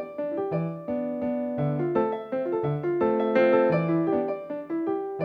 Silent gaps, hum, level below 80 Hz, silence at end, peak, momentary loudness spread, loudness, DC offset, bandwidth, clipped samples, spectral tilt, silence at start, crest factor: none; none; -64 dBFS; 0 s; -8 dBFS; 9 LU; -26 LUFS; under 0.1%; 5.2 kHz; under 0.1%; -10 dB/octave; 0 s; 16 dB